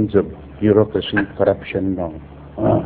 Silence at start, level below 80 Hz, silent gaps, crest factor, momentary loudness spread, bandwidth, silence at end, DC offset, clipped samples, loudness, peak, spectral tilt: 0 s; -40 dBFS; none; 18 dB; 13 LU; 4.5 kHz; 0 s; under 0.1%; under 0.1%; -19 LUFS; 0 dBFS; -11 dB/octave